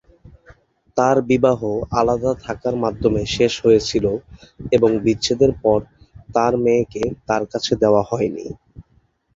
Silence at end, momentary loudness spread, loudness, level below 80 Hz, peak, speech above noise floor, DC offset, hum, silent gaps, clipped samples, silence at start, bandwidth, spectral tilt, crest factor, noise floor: 0.55 s; 8 LU; -19 LUFS; -42 dBFS; -2 dBFS; 42 dB; under 0.1%; none; none; under 0.1%; 0.25 s; 7.8 kHz; -5.5 dB/octave; 18 dB; -60 dBFS